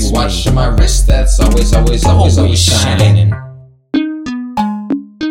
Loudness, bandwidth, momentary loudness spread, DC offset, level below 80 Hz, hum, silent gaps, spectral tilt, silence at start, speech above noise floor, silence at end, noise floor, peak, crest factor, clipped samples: -12 LUFS; 16 kHz; 10 LU; under 0.1%; -14 dBFS; none; none; -5 dB/octave; 0 s; 25 dB; 0 s; -34 dBFS; 0 dBFS; 10 dB; under 0.1%